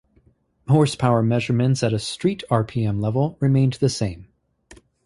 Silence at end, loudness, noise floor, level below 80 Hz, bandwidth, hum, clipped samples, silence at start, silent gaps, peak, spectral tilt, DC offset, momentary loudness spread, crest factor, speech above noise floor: 0.3 s; -21 LUFS; -60 dBFS; -50 dBFS; 11.5 kHz; none; under 0.1%; 0.7 s; none; -4 dBFS; -6.5 dB/octave; under 0.1%; 6 LU; 18 dB; 40 dB